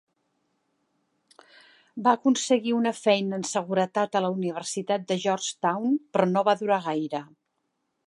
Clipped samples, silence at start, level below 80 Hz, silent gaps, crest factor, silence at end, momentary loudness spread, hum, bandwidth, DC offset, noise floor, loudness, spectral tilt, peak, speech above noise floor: under 0.1%; 1.95 s; -82 dBFS; none; 20 dB; 0.8 s; 7 LU; none; 11.5 kHz; under 0.1%; -77 dBFS; -25 LUFS; -4.5 dB/octave; -6 dBFS; 52 dB